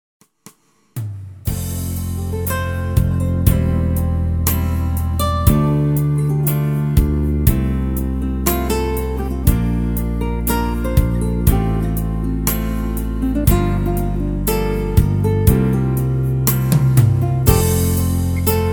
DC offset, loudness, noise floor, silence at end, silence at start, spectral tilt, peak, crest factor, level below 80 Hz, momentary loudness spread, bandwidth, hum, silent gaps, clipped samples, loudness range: 0.3%; -18 LUFS; -47 dBFS; 0 s; 0.95 s; -6.5 dB/octave; 0 dBFS; 16 dB; -22 dBFS; 7 LU; over 20 kHz; none; none; under 0.1%; 4 LU